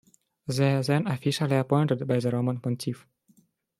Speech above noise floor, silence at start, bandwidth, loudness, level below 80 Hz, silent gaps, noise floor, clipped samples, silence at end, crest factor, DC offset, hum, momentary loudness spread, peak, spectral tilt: 39 dB; 0.45 s; 14 kHz; -26 LUFS; -66 dBFS; none; -64 dBFS; under 0.1%; 0.85 s; 18 dB; under 0.1%; none; 9 LU; -8 dBFS; -6.5 dB/octave